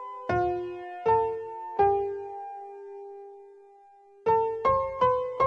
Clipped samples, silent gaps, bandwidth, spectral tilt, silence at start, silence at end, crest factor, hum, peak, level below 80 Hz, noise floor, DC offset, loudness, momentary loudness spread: under 0.1%; none; 7 kHz; -7.5 dB/octave; 0 s; 0 s; 16 dB; none; -12 dBFS; -56 dBFS; -55 dBFS; under 0.1%; -27 LUFS; 18 LU